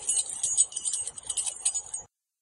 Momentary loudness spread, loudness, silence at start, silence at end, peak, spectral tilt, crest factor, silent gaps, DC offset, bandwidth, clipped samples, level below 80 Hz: 10 LU; -27 LUFS; 0 s; 0.35 s; -8 dBFS; 2.5 dB/octave; 22 dB; none; under 0.1%; 12 kHz; under 0.1%; -68 dBFS